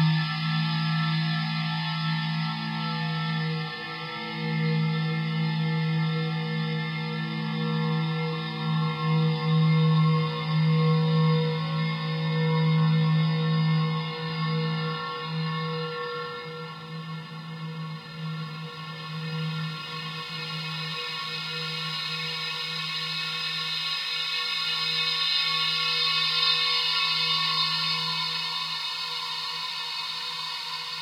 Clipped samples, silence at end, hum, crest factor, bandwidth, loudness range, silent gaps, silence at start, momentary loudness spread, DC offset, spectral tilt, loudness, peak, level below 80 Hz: under 0.1%; 0 s; none; 16 dB; 11 kHz; 10 LU; none; 0 s; 11 LU; under 0.1%; -5.5 dB/octave; -26 LUFS; -10 dBFS; -72 dBFS